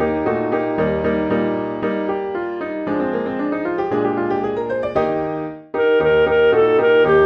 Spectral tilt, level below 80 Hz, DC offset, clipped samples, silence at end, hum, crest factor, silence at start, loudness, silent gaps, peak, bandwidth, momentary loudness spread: -8.5 dB/octave; -44 dBFS; under 0.1%; under 0.1%; 0 s; none; 14 dB; 0 s; -19 LUFS; none; -4 dBFS; 5.6 kHz; 9 LU